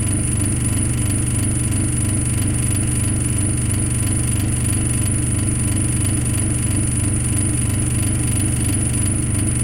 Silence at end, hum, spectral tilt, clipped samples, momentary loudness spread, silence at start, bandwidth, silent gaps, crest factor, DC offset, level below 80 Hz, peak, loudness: 0 s; 50 Hz at -25 dBFS; -4.5 dB/octave; under 0.1%; 1 LU; 0 s; 16.5 kHz; none; 14 dB; under 0.1%; -28 dBFS; -6 dBFS; -19 LUFS